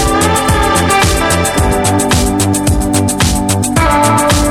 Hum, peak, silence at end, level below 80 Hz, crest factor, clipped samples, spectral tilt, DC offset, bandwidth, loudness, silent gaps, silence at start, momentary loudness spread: none; 0 dBFS; 0 s; -20 dBFS; 10 dB; under 0.1%; -4 dB/octave; under 0.1%; 17.5 kHz; -11 LUFS; none; 0 s; 3 LU